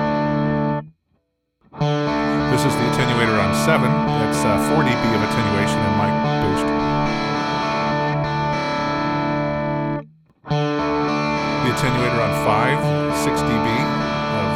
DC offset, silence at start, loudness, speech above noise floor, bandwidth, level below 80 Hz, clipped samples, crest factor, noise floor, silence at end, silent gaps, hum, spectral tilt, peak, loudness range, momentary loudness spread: under 0.1%; 0 s; -19 LUFS; 50 dB; 16 kHz; -42 dBFS; under 0.1%; 16 dB; -68 dBFS; 0 s; none; none; -6 dB/octave; -2 dBFS; 4 LU; 5 LU